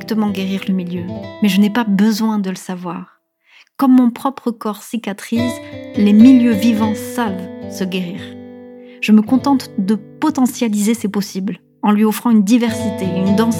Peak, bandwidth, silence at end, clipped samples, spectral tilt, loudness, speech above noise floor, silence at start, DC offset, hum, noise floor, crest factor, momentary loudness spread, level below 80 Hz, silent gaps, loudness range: 0 dBFS; 16.5 kHz; 0 s; under 0.1%; -6 dB/octave; -16 LUFS; 36 dB; 0 s; under 0.1%; none; -51 dBFS; 16 dB; 14 LU; -60 dBFS; none; 4 LU